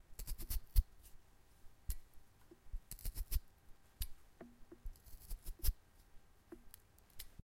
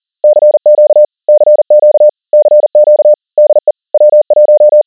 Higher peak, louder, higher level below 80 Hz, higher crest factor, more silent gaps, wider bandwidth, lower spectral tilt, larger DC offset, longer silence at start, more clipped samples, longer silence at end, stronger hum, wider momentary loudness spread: second, -18 dBFS vs 0 dBFS; second, -48 LUFS vs -7 LUFS; first, -46 dBFS vs -70 dBFS; first, 26 dB vs 6 dB; neither; first, 16.5 kHz vs 1.1 kHz; second, -4 dB/octave vs -9.5 dB/octave; neither; second, 0.1 s vs 0.25 s; second, under 0.1% vs 1%; first, 0.2 s vs 0.05 s; neither; first, 27 LU vs 4 LU